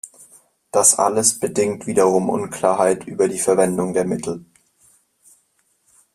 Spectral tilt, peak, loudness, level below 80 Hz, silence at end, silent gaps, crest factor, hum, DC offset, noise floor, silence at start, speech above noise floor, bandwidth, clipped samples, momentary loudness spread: -4 dB/octave; 0 dBFS; -18 LUFS; -60 dBFS; 1.75 s; none; 20 dB; none; under 0.1%; -64 dBFS; 0.05 s; 46 dB; 15 kHz; under 0.1%; 10 LU